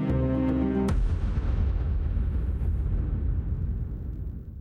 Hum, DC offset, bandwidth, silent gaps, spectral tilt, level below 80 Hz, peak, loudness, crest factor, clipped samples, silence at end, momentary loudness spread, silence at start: none; under 0.1%; 8.8 kHz; none; -9.5 dB/octave; -28 dBFS; -16 dBFS; -29 LUFS; 10 dB; under 0.1%; 0 s; 9 LU; 0 s